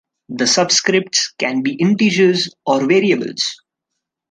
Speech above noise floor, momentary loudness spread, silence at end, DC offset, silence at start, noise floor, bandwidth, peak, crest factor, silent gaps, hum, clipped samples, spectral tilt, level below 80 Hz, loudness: 63 dB; 7 LU; 0.75 s; under 0.1%; 0.3 s; -78 dBFS; 10 kHz; -2 dBFS; 16 dB; none; none; under 0.1%; -3.5 dB/octave; -66 dBFS; -15 LUFS